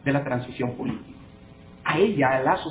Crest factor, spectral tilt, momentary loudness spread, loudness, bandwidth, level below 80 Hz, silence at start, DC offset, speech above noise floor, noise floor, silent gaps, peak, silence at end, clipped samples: 18 dB; -10.5 dB/octave; 12 LU; -25 LUFS; 4 kHz; -54 dBFS; 0.05 s; under 0.1%; 23 dB; -47 dBFS; none; -8 dBFS; 0 s; under 0.1%